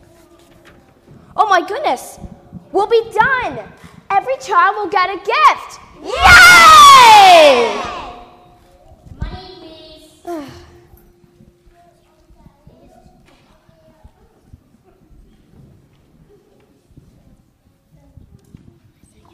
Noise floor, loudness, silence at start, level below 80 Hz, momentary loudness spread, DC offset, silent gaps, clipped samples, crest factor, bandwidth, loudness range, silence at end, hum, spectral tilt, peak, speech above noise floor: -55 dBFS; -8 LUFS; 1.35 s; -38 dBFS; 28 LU; under 0.1%; none; 0.3%; 14 dB; over 20 kHz; 12 LU; 8.9 s; none; -1.5 dB/octave; 0 dBFS; 45 dB